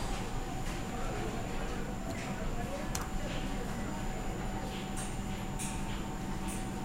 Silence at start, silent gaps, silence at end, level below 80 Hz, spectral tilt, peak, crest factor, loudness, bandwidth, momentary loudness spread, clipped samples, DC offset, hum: 0 s; none; 0 s; -40 dBFS; -5 dB/octave; -16 dBFS; 20 dB; -38 LUFS; 16 kHz; 2 LU; under 0.1%; 0.2%; none